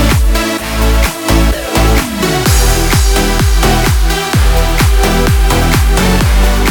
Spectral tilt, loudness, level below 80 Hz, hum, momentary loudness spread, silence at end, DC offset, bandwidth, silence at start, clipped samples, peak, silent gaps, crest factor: -4.5 dB/octave; -11 LUFS; -12 dBFS; none; 3 LU; 0 s; under 0.1%; 19 kHz; 0 s; under 0.1%; 0 dBFS; none; 10 dB